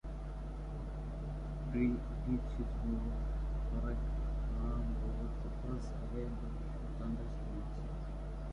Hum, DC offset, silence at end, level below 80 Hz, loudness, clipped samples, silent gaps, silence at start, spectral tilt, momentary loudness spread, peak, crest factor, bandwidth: none; under 0.1%; 0 s; -40 dBFS; -41 LUFS; under 0.1%; none; 0.05 s; -9 dB/octave; 6 LU; -22 dBFS; 16 dB; 6.8 kHz